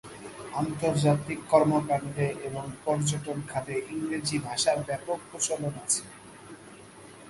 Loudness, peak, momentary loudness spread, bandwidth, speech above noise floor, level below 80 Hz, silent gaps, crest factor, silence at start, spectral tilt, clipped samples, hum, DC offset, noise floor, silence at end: -29 LUFS; -8 dBFS; 22 LU; 11.5 kHz; 20 dB; -62 dBFS; none; 22 dB; 0.05 s; -4.5 dB/octave; under 0.1%; none; under 0.1%; -49 dBFS; 0 s